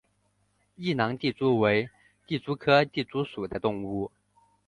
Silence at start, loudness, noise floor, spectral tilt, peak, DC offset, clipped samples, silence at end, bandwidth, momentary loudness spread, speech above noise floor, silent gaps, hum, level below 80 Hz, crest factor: 0.8 s; -27 LUFS; -71 dBFS; -7.5 dB/octave; -8 dBFS; under 0.1%; under 0.1%; 0.6 s; 10.5 kHz; 12 LU; 44 dB; none; 50 Hz at -60 dBFS; -60 dBFS; 20 dB